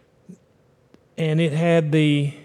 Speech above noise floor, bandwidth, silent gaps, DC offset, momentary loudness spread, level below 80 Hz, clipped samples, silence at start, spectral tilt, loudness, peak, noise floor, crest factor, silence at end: 40 dB; 10.5 kHz; none; under 0.1%; 8 LU; -72 dBFS; under 0.1%; 0.3 s; -7.5 dB/octave; -20 LUFS; -6 dBFS; -59 dBFS; 16 dB; 0.05 s